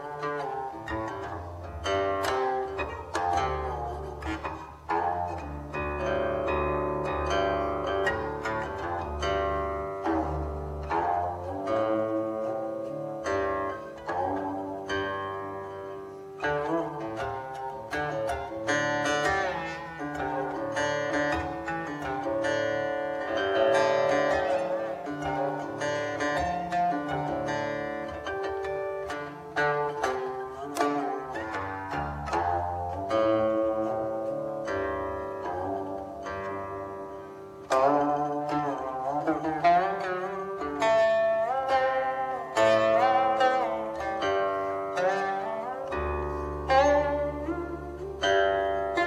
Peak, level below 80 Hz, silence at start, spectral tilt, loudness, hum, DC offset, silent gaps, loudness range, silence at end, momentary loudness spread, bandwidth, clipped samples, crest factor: -10 dBFS; -48 dBFS; 0 s; -5 dB/octave; -29 LUFS; none; under 0.1%; none; 6 LU; 0 s; 11 LU; 14 kHz; under 0.1%; 20 dB